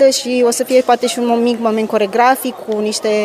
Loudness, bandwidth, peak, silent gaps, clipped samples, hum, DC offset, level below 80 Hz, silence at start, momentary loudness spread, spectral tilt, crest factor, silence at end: -14 LUFS; 16 kHz; 0 dBFS; none; under 0.1%; none; under 0.1%; -62 dBFS; 0 s; 6 LU; -3 dB/octave; 12 dB; 0 s